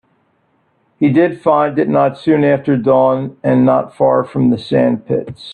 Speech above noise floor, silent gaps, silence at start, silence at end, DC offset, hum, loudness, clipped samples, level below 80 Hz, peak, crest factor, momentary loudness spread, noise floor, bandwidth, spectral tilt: 47 dB; none; 1 s; 0 s; under 0.1%; none; -14 LUFS; under 0.1%; -54 dBFS; 0 dBFS; 14 dB; 5 LU; -60 dBFS; 8.8 kHz; -9 dB/octave